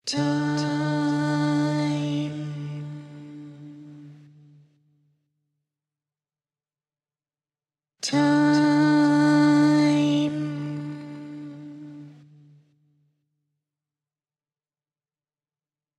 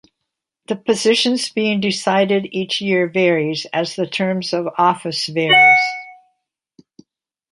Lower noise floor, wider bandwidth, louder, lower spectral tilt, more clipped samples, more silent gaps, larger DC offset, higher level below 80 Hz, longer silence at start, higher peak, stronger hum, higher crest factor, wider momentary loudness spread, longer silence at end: first, under -90 dBFS vs -79 dBFS; about the same, 10.5 kHz vs 11.5 kHz; second, -22 LUFS vs -16 LUFS; first, -6 dB/octave vs -4 dB/octave; neither; neither; neither; second, -74 dBFS vs -66 dBFS; second, 0.05 s vs 0.7 s; second, -10 dBFS vs -2 dBFS; neither; about the same, 16 dB vs 18 dB; first, 23 LU vs 11 LU; first, 3.85 s vs 1.4 s